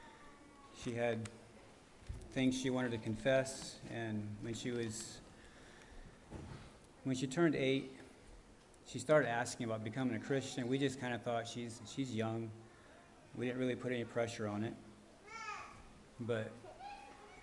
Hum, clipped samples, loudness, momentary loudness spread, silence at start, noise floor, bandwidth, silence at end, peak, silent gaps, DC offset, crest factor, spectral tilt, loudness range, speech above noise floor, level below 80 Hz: none; under 0.1%; -39 LUFS; 24 LU; 0 s; -61 dBFS; 11.5 kHz; 0 s; -18 dBFS; none; under 0.1%; 22 dB; -5.5 dB/octave; 7 LU; 23 dB; -64 dBFS